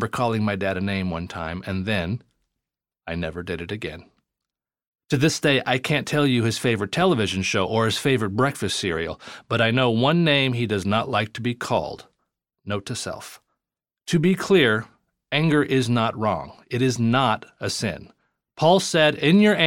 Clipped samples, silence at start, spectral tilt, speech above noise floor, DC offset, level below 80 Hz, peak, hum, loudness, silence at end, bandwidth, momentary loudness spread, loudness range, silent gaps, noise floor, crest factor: under 0.1%; 0 s; -5 dB/octave; 66 dB; under 0.1%; -54 dBFS; -2 dBFS; none; -22 LUFS; 0 s; 17 kHz; 13 LU; 8 LU; 4.87-4.92 s; -88 dBFS; 20 dB